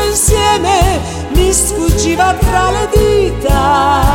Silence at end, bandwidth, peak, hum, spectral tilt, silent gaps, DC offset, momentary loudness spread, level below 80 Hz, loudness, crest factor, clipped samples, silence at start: 0 s; 18.5 kHz; 0 dBFS; none; -4 dB/octave; none; under 0.1%; 3 LU; -18 dBFS; -11 LUFS; 10 dB; under 0.1%; 0 s